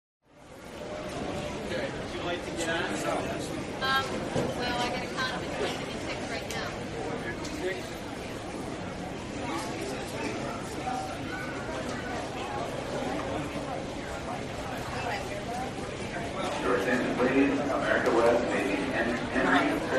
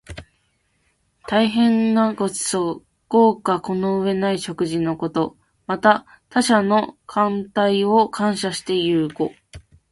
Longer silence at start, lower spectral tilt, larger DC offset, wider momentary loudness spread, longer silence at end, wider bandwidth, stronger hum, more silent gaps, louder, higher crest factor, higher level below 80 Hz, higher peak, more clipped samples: first, 0.35 s vs 0.1 s; about the same, -4.5 dB/octave vs -5 dB/octave; neither; about the same, 11 LU vs 10 LU; second, 0 s vs 0.35 s; first, 14.5 kHz vs 11.5 kHz; neither; neither; second, -31 LUFS vs -20 LUFS; about the same, 22 dB vs 20 dB; about the same, -50 dBFS vs -54 dBFS; second, -10 dBFS vs 0 dBFS; neither